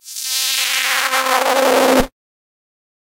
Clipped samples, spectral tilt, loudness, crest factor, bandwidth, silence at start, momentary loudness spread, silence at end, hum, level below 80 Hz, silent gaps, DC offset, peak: under 0.1%; -1 dB/octave; -15 LUFS; 18 dB; 17 kHz; 0.05 s; 5 LU; 0.95 s; none; -38 dBFS; none; under 0.1%; 0 dBFS